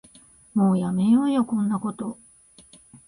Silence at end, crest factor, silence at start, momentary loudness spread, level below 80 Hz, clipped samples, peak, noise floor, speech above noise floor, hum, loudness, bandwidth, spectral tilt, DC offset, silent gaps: 0.1 s; 14 dB; 0.55 s; 15 LU; -62 dBFS; under 0.1%; -10 dBFS; -53 dBFS; 31 dB; none; -23 LUFS; 10.5 kHz; -8 dB/octave; under 0.1%; none